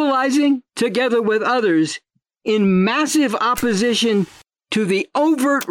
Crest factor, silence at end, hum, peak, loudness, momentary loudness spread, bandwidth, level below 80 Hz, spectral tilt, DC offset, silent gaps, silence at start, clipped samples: 8 dB; 0 s; none; -8 dBFS; -18 LUFS; 6 LU; 17 kHz; -54 dBFS; -4.5 dB/octave; under 0.1%; none; 0 s; under 0.1%